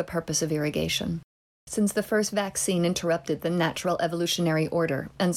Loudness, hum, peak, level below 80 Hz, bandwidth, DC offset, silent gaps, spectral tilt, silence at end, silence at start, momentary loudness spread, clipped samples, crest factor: -26 LUFS; none; -12 dBFS; -54 dBFS; 16 kHz; under 0.1%; 1.24-1.67 s; -4.5 dB/octave; 0 s; 0 s; 4 LU; under 0.1%; 14 dB